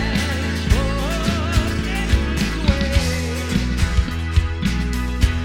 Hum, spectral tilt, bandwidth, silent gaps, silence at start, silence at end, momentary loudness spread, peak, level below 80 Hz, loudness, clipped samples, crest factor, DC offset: none; -5.5 dB/octave; 16.5 kHz; none; 0 s; 0 s; 3 LU; -2 dBFS; -22 dBFS; -21 LUFS; under 0.1%; 18 dB; 0.3%